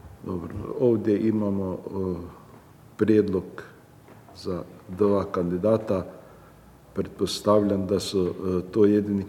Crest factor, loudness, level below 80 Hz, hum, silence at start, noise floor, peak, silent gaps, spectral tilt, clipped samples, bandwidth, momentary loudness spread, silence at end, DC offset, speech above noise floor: 18 dB; -25 LUFS; -56 dBFS; none; 0.05 s; -51 dBFS; -8 dBFS; none; -7 dB/octave; under 0.1%; 15.5 kHz; 14 LU; 0 s; under 0.1%; 26 dB